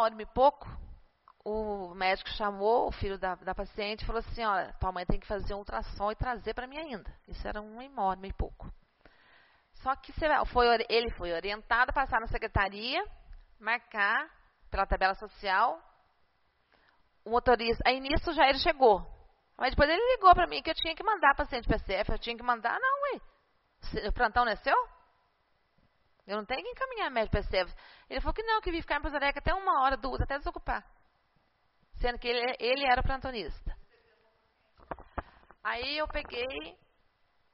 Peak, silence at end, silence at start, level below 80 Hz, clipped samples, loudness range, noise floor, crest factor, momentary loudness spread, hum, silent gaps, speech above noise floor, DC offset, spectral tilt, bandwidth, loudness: -8 dBFS; 0.8 s; 0 s; -42 dBFS; under 0.1%; 10 LU; -73 dBFS; 24 dB; 15 LU; none; none; 42 dB; under 0.1%; -2 dB/octave; 5.8 kHz; -30 LUFS